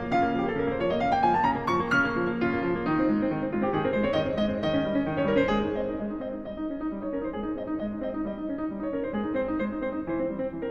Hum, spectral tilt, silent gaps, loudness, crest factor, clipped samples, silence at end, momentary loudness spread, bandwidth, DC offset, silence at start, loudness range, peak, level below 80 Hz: none; -7.5 dB/octave; none; -28 LUFS; 16 dB; under 0.1%; 0 s; 8 LU; 7.6 kHz; under 0.1%; 0 s; 6 LU; -10 dBFS; -48 dBFS